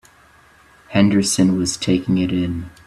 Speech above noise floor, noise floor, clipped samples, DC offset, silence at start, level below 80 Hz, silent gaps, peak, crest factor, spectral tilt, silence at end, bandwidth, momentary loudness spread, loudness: 33 dB; -50 dBFS; under 0.1%; under 0.1%; 0.9 s; -48 dBFS; none; -2 dBFS; 18 dB; -5 dB/octave; 0.15 s; 13 kHz; 7 LU; -18 LUFS